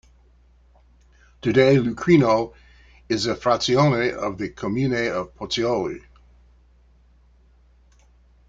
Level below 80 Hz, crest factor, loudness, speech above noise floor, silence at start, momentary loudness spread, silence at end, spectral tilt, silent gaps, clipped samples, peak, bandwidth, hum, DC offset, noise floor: -50 dBFS; 20 dB; -21 LUFS; 35 dB; 1.45 s; 12 LU; 2.5 s; -6 dB/octave; none; under 0.1%; -2 dBFS; 7.8 kHz; none; under 0.1%; -55 dBFS